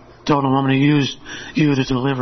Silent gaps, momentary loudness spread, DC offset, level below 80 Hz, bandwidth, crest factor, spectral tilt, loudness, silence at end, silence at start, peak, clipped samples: none; 9 LU; under 0.1%; -44 dBFS; 6.4 kHz; 14 dB; -6.5 dB/octave; -18 LUFS; 0 s; 0.25 s; -4 dBFS; under 0.1%